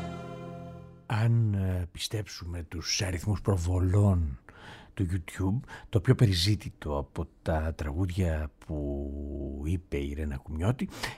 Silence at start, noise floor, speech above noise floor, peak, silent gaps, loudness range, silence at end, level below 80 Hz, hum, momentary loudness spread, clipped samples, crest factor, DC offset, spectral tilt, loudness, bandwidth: 0 s; -49 dBFS; 20 dB; -8 dBFS; none; 5 LU; 0 s; -40 dBFS; none; 15 LU; under 0.1%; 22 dB; under 0.1%; -6 dB/octave; -30 LUFS; 14 kHz